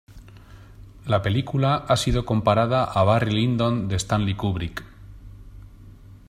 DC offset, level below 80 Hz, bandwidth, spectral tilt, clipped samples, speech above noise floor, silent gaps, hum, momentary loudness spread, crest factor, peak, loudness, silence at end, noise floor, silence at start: under 0.1%; -40 dBFS; 14 kHz; -6 dB/octave; under 0.1%; 24 dB; none; none; 7 LU; 20 dB; -4 dBFS; -22 LUFS; 0.15 s; -45 dBFS; 0.1 s